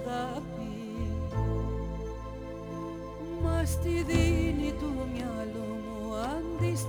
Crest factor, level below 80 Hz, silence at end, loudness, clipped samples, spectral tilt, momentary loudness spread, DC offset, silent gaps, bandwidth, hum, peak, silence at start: 18 dB; -38 dBFS; 0 s; -33 LUFS; under 0.1%; -6.5 dB/octave; 12 LU; under 0.1%; none; over 20 kHz; none; -12 dBFS; 0 s